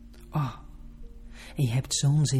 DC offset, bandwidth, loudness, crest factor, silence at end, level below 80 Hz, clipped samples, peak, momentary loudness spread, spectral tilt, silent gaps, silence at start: under 0.1%; 14.5 kHz; -28 LUFS; 14 dB; 0 s; -46 dBFS; under 0.1%; -14 dBFS; 25 LU; -5 dB/octave; none; 0.05 s